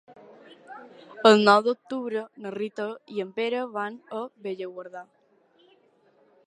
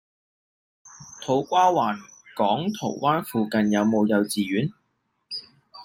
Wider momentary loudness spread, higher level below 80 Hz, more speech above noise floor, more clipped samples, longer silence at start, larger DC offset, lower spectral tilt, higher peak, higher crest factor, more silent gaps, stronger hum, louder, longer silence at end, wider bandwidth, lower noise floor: first, 27 LU vs 15 LU; second, -82 dBFS vs -66 dBFS; second, 37 dB vs 51 dB; neither; second, 0.1 s vs 0.85 s; neither; about the same, -5 dB/octave vs -5.5 dB/octave; first, -2 dBFS vs -6 dBFS; first, 26 dB vs 18 dB; neither; neither; about the same, -25 LUFS vs -23 LUFS; first, 1.45 s vs 0 s; second, 11 kHz vs 16 kHz; second, -62 dBFS vs -73 dBFS